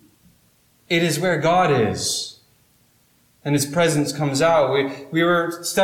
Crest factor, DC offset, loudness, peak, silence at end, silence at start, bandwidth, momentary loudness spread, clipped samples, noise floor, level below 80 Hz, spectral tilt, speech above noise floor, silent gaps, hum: 14 dB; under 0.1%; -20 LUFS; -8 dBFS; 0 s; 0.9 s; 18 kHz; 7 LU; under 0.1%; -59 dBFS; -58 dBFS; -4.5 dB/octave; 40 dB; none; none